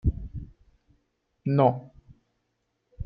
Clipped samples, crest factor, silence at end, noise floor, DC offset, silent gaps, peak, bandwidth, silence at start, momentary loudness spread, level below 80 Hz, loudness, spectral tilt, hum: under 0.1%; 22 dB; 0 s; -77 dBFS; under 0.1%; none; -8 dBFS; 5 kHz; 0.05 s; 20 LU; -40 dBFS; -26 LUFS; -11.5 dB/octave; none